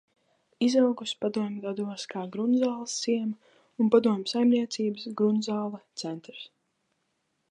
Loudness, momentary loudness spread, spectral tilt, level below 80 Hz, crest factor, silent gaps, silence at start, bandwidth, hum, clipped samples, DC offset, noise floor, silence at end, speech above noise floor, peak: -28 LUFS; 14 LU; -5 dB/octave; -80 dBFS; 20 dB; none; 0.6 s; 10 kHz; none; under 0.1%; under 0.1%; -77 dBFS; 1.05 s; 50 dB; -8 dBFS